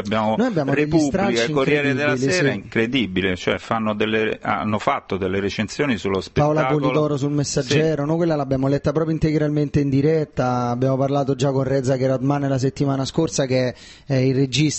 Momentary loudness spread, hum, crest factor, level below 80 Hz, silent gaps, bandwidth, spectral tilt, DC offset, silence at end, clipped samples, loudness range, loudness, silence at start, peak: 4 LU; none; 16 dB; -46 dBFS; none; 8.4 kHz; -6 dB/octave; under 0.1%; 0 s; under 0.1%; 2 LU; -20 LUFS; 0 s; -4 dBFS